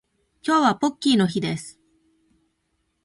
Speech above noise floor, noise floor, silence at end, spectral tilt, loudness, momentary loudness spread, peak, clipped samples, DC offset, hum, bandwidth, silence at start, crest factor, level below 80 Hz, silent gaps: 52 dB; -72 dBFS; 1.35 s; -5 dB/octave; -22 LUFS; 13 LU; -6 dBFS; under 0.1%; under 0.1%; none; 11.5 kHz; 0.45 s; 18 dB; -64 dBFS; none